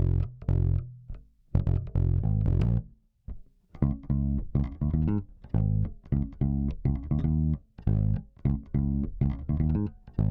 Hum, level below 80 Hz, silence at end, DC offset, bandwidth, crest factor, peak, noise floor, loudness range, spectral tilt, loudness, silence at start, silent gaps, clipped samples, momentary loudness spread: none; -34 dBFS; 0 s; under 0.1%; 3.9 kHz; 18 dB; -8 dBFS; -46 dBFS; 1 LU; -12 dB/octave; -29 LUFS; 0 s; none; under 0.1%; 6 LU